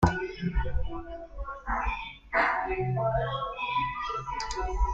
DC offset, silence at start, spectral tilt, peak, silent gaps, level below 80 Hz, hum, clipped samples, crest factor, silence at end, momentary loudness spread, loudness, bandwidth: under 0.1%; 0 s; -6 dB/octave; -8 dBFS; none; -36 dBFS; none; under 0.1%; 22 dB; 0 s; 12 LU; -31 LUFS; 8 kHz